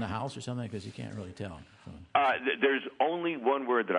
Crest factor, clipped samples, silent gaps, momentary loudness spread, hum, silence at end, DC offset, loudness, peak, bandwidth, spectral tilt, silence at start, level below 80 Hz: 20 dB; under 0.1%; none; 15 LU; none; 0 s; under 0.1%; -31 LUFS; -10 dBFS; 10.5 kHz; -5.5 dB/octave; 0 s; -68 dBFS